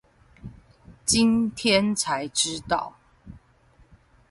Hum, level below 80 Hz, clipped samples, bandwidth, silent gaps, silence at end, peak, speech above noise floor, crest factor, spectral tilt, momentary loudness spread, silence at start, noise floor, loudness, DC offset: none; -52 dBFS; under 0.1%; 11.5 kHz; none; 0.95 s; -8 dBFS; 35 dB; 18 dB; -3 dB/octave; 25 LU; 0.45 s; -58 dBFS; -23 LUFS; under 0.1%